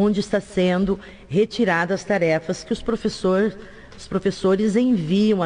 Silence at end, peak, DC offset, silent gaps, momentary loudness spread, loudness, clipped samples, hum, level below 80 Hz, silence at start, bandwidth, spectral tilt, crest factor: 0 s; -8 dBFS; under 0.1%; none; 7 LU; -21 LUFS; under 0.1%; none; -48 dBFS; 0 s; 10.5 kHz; -6.5 dB/octave; 12 dB